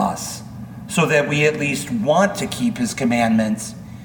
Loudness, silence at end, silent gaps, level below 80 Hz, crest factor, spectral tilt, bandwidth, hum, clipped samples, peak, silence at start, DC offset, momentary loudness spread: -19 LUFS; 0 s; none; -50 dBFS; 18 dB; -5 dB/octave; 19 kHz; none; under 0.1%; -2 dBFS; 0 s; under 0.1%; 13 LU